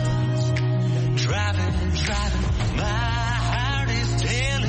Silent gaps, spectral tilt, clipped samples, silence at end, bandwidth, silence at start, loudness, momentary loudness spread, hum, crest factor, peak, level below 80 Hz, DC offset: none; -5 dB/octave; under 0.1%; 0 s; 8.8 kHz; 0 s; -23 LUFS; 2 LU; none; 12 dB; -10 dBFS; -30 dBFS; under 0.1%